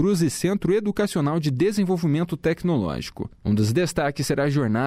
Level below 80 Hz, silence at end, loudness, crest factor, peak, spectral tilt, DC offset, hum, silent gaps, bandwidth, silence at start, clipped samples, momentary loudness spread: -48 dBFS; 0 s; -23 LUFS; 12 dB; -10 dBFS; -6.5 dB/octave; under 0.1%; none; none; 15.5 kHz; 0 s; under 0.1%; 4 LU